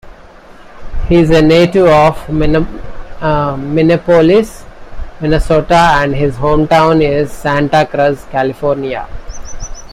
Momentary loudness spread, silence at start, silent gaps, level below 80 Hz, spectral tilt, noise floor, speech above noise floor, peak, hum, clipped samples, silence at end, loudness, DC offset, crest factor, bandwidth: 20 LU; 0.05 s; none; -24 dBFS; -6.5 dB/octave; -36 dBFS; 26 dB; 0 dBFS; none; under 0.1%; 0 s; -11 LUFS; under 0.1%; 12 dB; 15 kHz